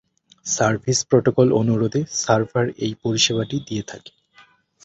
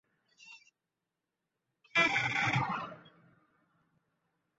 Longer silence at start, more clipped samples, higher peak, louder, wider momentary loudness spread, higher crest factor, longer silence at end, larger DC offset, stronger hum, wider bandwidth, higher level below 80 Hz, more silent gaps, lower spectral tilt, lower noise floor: about the same, 0.45 s vs 0.45 s; neither; first, -2 dBFS vs -16 dBFS; first, -20 LUFS vs -30 LUFS; about the same, 12 LU vs 12 LU; about the same, 18 dB vs 22 dB; second, 0.85 s vs 1.6 s; neither; neither; first, 8.4 kHz vs 7.6 kHz; first, -54 dBFS vs -72 dBFS; neither; first, -4.5 dB/octave vs -2 dB/octave; second, -54 dBFS vs -88 dBFS